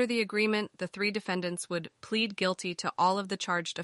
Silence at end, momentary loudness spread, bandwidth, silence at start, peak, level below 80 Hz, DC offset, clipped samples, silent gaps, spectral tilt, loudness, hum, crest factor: 0 s; 7 LU; 11.5 kHz; 0 s; -16 dBFS; -76 dBFS; under 0.1%; under 0.1%; none; -4 dB/octave; -31 LUFS; none; 16 dB